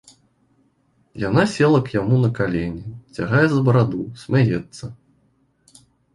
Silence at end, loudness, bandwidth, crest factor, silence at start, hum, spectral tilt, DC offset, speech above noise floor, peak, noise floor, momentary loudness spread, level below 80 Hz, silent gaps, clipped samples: 1.2 s; -19 LUFS; 11 kHz; 18 dB; 1.15 s; none; -7.5 dB/octave; under 0.1%; 44 dB; -2 dBFS; -62 dBFS; 18 LU; -48 dBFS; none; under 0.1%